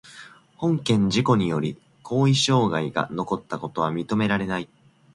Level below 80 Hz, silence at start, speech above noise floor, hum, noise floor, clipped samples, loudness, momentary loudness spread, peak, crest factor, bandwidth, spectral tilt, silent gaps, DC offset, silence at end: -56 dBFS; 0.05 s; 24 dB; none; -47 dBFS; under 0.1%; -23 LUFS; 11 LU; -6 dBFS; 18 dB; 11.5 kHz; -5.5 dB/octave; none; under 0.1%; 0.5 s